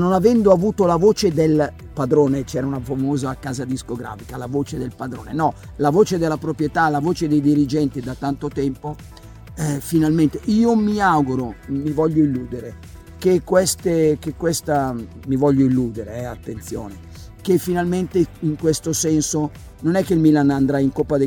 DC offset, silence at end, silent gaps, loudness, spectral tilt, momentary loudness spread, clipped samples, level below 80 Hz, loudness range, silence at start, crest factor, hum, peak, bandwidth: under 0.1%; 0 s; none; -19 LUFS; -6 dB/octave; 14 LU; under 0.1%; -42 dBFS; 4 LU; 0 s; 18 dB; none; -2 dBFS; 19 kHz